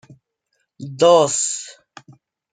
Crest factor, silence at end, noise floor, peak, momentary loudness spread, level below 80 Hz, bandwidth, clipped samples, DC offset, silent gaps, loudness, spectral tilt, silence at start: 18 dB; 0.8 s; -72 dBFS; -2 dBFS; 24 LU; -70 dBFS; 9.6 kHz; under 0.1%; under 0.1%; none; -16 LUFS; -3 dB/octave; 0.8 s